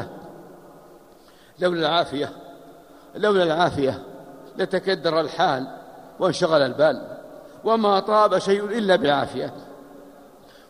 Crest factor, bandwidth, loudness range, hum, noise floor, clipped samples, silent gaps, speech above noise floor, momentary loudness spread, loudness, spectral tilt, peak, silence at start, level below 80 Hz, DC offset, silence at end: 20 dB; 15.5 kHz; 4 LU; none; -50 dBFS; under 0.1%; none; 30 dB; 23 LU; -22 LUFS; -5.5 dB/octave; -4 dBFS; 0 s; -60 dBFS; under 0.1%; 0.6 s